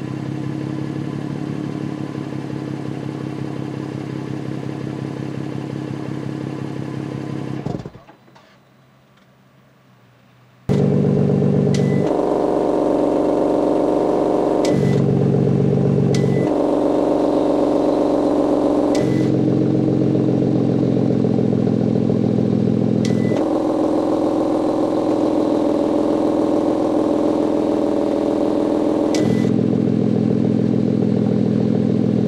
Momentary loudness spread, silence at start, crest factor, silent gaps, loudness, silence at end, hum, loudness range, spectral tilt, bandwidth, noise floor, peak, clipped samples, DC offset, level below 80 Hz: 10 LU; 0 s; 14 dB; none; -19 LUFS; 0 s; none; 10 LU; -8.5 dB/octave; 11.5 kHz; -52 dBFS; -6 dBFS; under 0.1%; under 0.1%; -48 dBFS